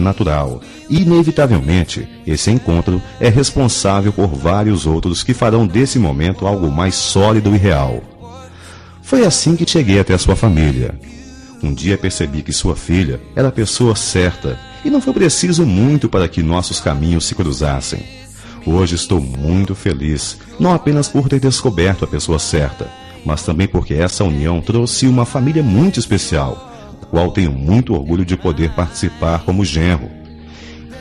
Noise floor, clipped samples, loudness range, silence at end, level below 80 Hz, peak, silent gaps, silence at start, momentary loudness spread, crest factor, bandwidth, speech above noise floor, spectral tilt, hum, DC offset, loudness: -36 dBFS; under 0.1%; 3 LU; 0 s; -28 dBFS; 0 dBFS; none; 0 s; 12 LU; 14 dB; 11.5 kHz; 22 dB; -5.5 dB/octave; none; under 0.1%; -15 LUFS